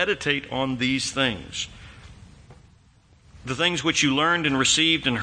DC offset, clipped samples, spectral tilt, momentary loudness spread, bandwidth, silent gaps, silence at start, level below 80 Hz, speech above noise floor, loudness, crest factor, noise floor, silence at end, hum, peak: under 0.1%; under 0.1%; -3 dB/octave; 13 LU; 9.8 kHz; none; 0 s; -52 dBFS; 33 dB; -22 LUFS; 18 dB; -56 dBFS; 0 s; none; -6 dBFS